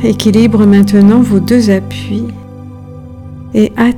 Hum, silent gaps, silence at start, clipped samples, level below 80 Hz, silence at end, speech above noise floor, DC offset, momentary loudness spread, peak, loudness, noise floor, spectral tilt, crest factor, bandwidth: none; none; 0 s; 2%; -38 dBFS; 0 s; 20 dB; under 0.1%; 23 LU; 0 dBFS; -9 LUFS; -28 dBFS; -7 dB/octave; 10 dB; 13 kHz